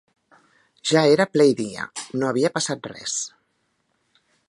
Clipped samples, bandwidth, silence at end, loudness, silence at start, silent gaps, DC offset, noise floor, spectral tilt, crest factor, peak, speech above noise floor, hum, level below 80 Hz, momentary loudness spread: under 0.1%; 11.5 kHz; 1.2 s; -22 LUFS; 0.85 s; none; under 0.1%; -70 dBFS; -4 dB/octave; 20 dB; -4 dBFS; 50 dB; none; -68 dBFS; 13 LU